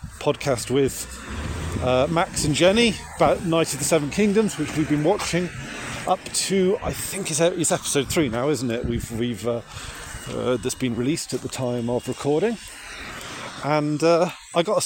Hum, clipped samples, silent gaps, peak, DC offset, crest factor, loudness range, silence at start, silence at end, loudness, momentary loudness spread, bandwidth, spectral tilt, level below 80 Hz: none; under 0.1%; none; -4 dBFS; under 0.1%; 18 dB; 5 LU; 0 s; 0 s; -23 LUFS; 12 LU; 17 kHz; -4.5 dB/octave; -44 dBFS